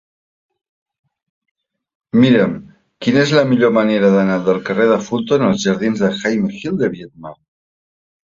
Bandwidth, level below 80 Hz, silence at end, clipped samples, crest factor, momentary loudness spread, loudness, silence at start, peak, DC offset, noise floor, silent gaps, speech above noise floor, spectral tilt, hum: 7.6 kHz; -54 dBFS; 1.05 s; under 0.1%; 16 dB; 9 LU; -15 LUFS; 2.15 s; -2 dBFS; under 0.1%; under -90 dBFS; none; over 75 dB; -6 dB/octave; none